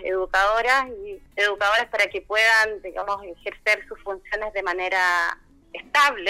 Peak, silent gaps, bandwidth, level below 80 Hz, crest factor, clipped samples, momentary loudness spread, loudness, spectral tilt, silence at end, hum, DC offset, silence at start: -4 dBFS; none; 16 kHz; -50 dBFS; 18 dB; under 0.1%; 15 LU; -22 LUFS; -1 dB/octave; 0 s; none; under 0.1%; 0 s